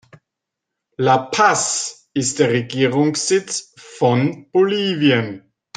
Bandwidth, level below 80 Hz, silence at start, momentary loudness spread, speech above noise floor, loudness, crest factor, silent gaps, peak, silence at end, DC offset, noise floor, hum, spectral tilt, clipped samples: 10 kHz; -62 dBFS; 1 s; 9 LU; 64 dB; -18 LUFS; 18 dB; none; 0 dBFS; 0.4 s; under 0.1%; -82 dBFS; none; -4 dB/octave; under 0.1%